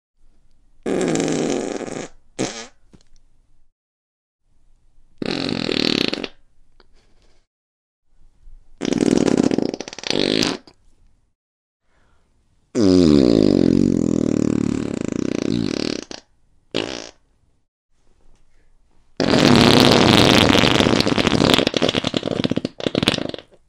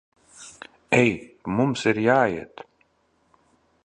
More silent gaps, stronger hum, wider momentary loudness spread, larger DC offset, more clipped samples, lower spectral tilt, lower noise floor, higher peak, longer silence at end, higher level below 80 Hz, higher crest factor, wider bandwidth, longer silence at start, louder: first, 3.72-4.39 s, 7.47-8.03 s, 11.35-11.80 s, 17.68-17.89 s vs none; neither; second, 17 LU vs 24 LU; neither; neither; about the same, -5 dB/octave vs -6 dB/octave; second, -60 dBFS vs -66 dBFS; first, 0 dBFS vs -4 dBFS; second, 0.25 s vs 1.4 s; first, -42 dBFS vs -58 dBFS; about the same, 20 dB vs 22 dB; first, 16 kHz vs 11 kHz; first, 0.85 s vs 0.4 s; first, -18 LUFS vs -22 LUFS